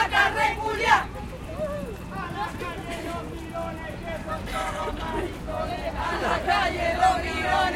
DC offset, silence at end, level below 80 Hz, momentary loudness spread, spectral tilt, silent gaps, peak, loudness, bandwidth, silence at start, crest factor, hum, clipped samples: under 0.1%; 0 s; -40 dBFS; 13 LU; -4.5 dB/octave; none; -4 dBFS; -27 LUFS; 16.5 kHz; 0 s; 22 dB; none; under 0.1%